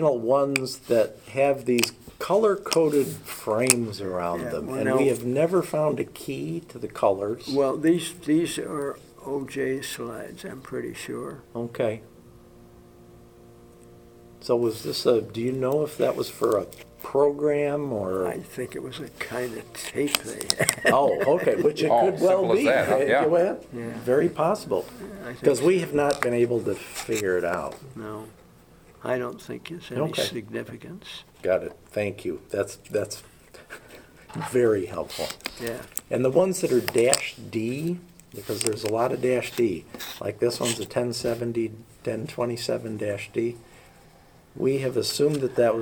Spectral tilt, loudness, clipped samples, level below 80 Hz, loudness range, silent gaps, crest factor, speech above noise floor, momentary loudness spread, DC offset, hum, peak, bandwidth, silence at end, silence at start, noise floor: -4.5 dB/octave; -25 LUFS; under 0.1%; -60 dBFS; 9 LU; none; 26 dB; 28 dB; 15 LU; under 0.1%; none; 0 dBFS; over 20 kHz; 0 s; 0 s; -53 dBFS